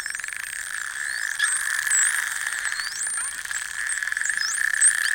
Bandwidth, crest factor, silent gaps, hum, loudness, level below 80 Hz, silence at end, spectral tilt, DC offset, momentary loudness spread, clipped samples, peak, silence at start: 17 kHz; 20 dB; none; none; -23 LUFS; -64 dBFS; 0 s; 4.5 dB/octave; under 0.1%; 11 LU; under 0.1%; -6 dBFS; 0 s